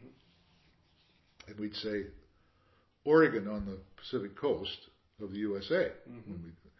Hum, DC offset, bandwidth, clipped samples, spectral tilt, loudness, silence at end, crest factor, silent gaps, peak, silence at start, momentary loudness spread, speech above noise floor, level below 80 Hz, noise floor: none; under 0.1%; 6 kHz; under 0.1%; -4 dB/octave; -33 LUFS; 0.25 s; 22 dB; none; -14 dBFS; 0 s; 21 LU; 36 dB; -60 dBFS; -69 dBFS